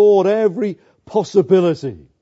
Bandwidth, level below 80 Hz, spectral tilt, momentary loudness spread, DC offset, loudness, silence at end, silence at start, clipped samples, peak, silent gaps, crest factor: 7.8 kHz; -60 dBFS; -7.5 dB/octave; 13 LU; under 0.1%; -17 LUFS; 0.25 s; 0 s; under 0.1%; -2 dBFS; none; 14 dB